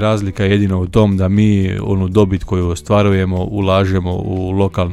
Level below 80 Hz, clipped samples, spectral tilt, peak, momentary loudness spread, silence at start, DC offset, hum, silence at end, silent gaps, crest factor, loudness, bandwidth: -34 dBFS; under 0.1%; -7.5 dB/octave; 0 dBFS; 5 LU; 0 s; under 0.1%; none; 0 s; none; 14 dB; -15 LUFS; 11 kHz